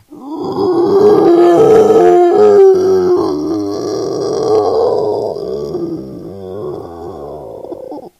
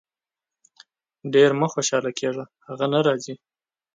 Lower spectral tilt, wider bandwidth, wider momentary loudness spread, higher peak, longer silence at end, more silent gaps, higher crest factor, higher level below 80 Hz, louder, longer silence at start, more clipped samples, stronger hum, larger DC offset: first, -7 dB/octave vs -4.5 dB/octave; first, 12.5 kHz vs 9.4 kHz; about the same, 20 LU vs 19 LU; first, 0 dBFS vs -6 dBFS; second, 0.1 s vs 0.6 s; neither; second, 12 dB vs 20 dB; first, -48 dBFS vs -74 dBFS; first, -10 LUFS vs -22 LUFS; second, 0.1 s vs 1.25 s; first, 0.3% vs under 0.1%; neither; neither